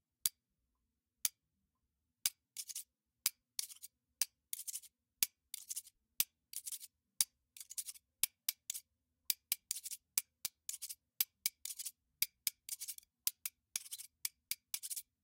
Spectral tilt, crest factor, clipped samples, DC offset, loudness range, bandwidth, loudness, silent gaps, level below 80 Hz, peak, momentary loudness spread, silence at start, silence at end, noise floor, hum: 3 dB/octave; 36 dB; under 0.1%; under 0.1%; 2 LU; 17 kHz; -41 LUFS; none; -86 dBFS; -8 dBFS; 11 LU; 0.25 s; 0.2 s; -87 dBFS; none